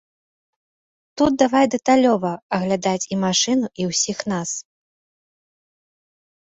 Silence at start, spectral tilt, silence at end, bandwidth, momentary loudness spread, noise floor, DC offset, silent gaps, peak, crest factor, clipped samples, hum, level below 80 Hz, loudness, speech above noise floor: 1.15 s; -4 dB/octave; 1.85 s; 8.2 kHz; 8 LU; under -90 dBFS; under 0.1%; 2.42-2.50 s; -2 dBFS; 18 dB; under 0.1%; none; -58 dBFS; -20 LUFS; over 71 dB